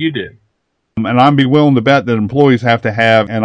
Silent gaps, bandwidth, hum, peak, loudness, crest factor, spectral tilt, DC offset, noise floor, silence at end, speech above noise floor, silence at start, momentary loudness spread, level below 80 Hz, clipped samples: none; 8.8 kHz; none; 0 dBFS; -11 LUFS; 12 dB; -7.5 dB/octave; under 0.1%; -67 dBFS; 0 s; 56 dB; 0 s; 12 LU; -50 dBFS; 0.3%